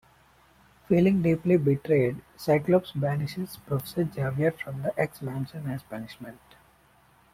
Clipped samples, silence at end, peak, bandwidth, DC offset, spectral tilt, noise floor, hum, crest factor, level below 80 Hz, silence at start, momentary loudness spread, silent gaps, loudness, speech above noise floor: under 0.1%; 1 s; -10 dBFS; 16.5 kHz; under 0.1%; -8 dB/octave; -60 dBFS; none; 18 dB; -58 dBFS; 0.9 s; 14 LU; none; -27 LUFS; 34 dB